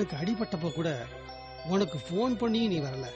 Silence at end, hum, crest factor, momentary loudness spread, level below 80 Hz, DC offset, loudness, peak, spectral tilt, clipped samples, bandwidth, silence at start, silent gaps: 0 s; none; 14 dB; 14 LU; -56 dBFS; under 0.1%; -31 LUFS; -16 dBFS; -6.5 dB/octave; under 0.1%; 8.4 kHz; 0 s; none